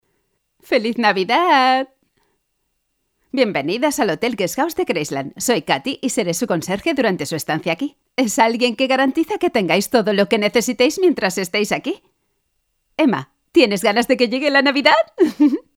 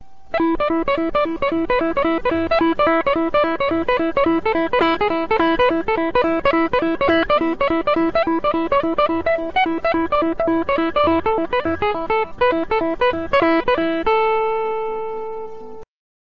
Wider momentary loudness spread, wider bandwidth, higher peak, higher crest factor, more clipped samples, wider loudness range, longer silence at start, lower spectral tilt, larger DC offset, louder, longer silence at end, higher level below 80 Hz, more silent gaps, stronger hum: first, 8 LU vs 5 LU; first, 17.5 kHz vs 6 kHz; first, 0 dBFS vs -4 dBFS; about the same, 18 dB vs 14 dB; neither; first, 4 LU vs 1 LU; first, 0.7 s vs 0.25 s; second, -4 dB/octave vs -7 dB/octave; second, under 0.1% vs 2%; about the same, -18 LUFS vs -19 LUFS; second, 0.15 s vs 0.3 s; second, -58 dBFS vs -42 dBFS; neither; neither